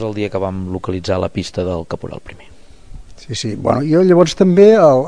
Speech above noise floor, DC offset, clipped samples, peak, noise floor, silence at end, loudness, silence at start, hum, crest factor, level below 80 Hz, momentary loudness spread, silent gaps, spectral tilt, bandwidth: 22 dB; 1%; under 0.1%; 0 dBFS; -36 dBFS; 0 s; -14 LUFS; 0 s; none; 14 dB; -42 dBFS; 18 LU; none; -6.5 dB/octave; 10.5 kHz